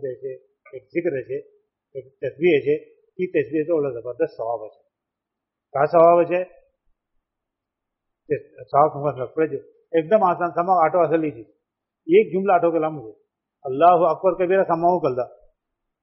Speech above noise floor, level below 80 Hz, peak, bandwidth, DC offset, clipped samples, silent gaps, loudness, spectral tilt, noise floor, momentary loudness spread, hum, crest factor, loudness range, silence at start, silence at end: 64 dB; -66 dBFS; -4 dBFS; 5.8 kHz; under 0.1%; under 0.1%; none; -21 LUFS; -6 dB/octave; -84 dBFS; 17 LU; none; 18 dB; 6 LU; 0 s; 0.75 s